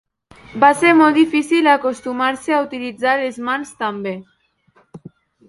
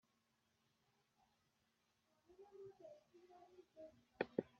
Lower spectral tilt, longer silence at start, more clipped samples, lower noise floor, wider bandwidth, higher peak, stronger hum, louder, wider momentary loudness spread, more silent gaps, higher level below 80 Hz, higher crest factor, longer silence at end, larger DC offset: about the same, -4.5 dB/octave vs -5 dB/octave; second, 0.5 s vs 2.3 s; neither; second, -57 dBFS vs -84 dBFS; first, 11.5 kHz vs 7 kHz; first, 0 dBFS vs -24 dBFS; neither; first, -16 LUFS vs -53 LUFS; second, 14 LU vs 21 LU; neither; first, -60 dBFS vs under -90 dBFS; second, 18 dB vs 32 dB; first, 0.5 s vs 0 s; neither